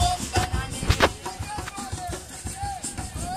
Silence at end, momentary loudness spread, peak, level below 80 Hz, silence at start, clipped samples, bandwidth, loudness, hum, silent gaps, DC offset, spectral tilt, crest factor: 0 s; 12 LU; -6 dBFS; -36 dBFS; 0 s; under 0.1%; 15.5 kHz; -28 LUFS; none; none; under 0.1%; -3.5 dB/octave; 22 dB